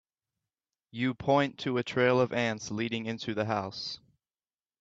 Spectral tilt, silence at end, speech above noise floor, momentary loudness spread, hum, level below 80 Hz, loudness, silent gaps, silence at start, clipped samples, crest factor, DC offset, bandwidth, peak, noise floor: -5.5 dB/octave; 0.85 s; over 60 dB; 12 LU; none; -68 dBFS; -30 LUFS; none; 0.95 s; under 0.1%; 20 dB; under 0.1%; 8 kHz; -12 dBFS; under -90 dBFS